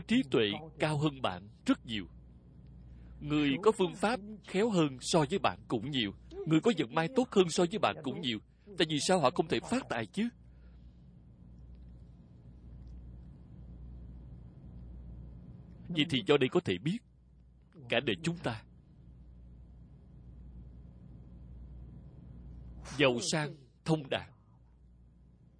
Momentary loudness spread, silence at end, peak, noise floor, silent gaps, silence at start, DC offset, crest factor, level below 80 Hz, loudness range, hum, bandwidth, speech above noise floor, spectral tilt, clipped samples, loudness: 24 LU; 1.3 s; -10 dBFS; -61 dBFS; none; 0 s; under 0.1%; 24 dB; -56 dBFS; 21 LU; none; 10.5 kHz; 29 dB; -5 dB/octave; under 0.1%; -32 LUFS